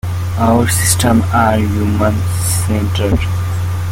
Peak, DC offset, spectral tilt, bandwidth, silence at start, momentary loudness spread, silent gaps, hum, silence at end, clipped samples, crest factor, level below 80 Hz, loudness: 0 dBFS; under 0.1%; -5 dB/octave; 17 kHz; 0.05 s; 6 LU; none; none; 0 s; under 0.1%; 14 dB; -30 dBFS; -14 LUFS